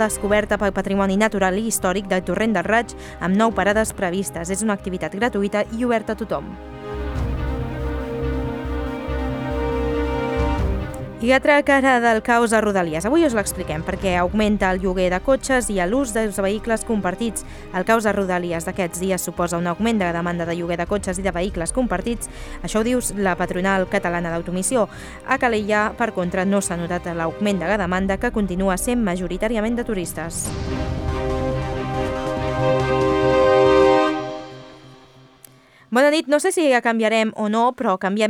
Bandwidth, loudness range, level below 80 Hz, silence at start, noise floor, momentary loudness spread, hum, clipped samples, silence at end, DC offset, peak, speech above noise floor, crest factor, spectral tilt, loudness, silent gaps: 18.5 kHz; 6 LU; -34 dBFS; 0 s; -49 dBFS; 9 LU; none; under 0.1%; 0 s; under 0.1%; -4 dBFS; 29 dB; 18 dB; -5 dB/octave; -21 LUFS; none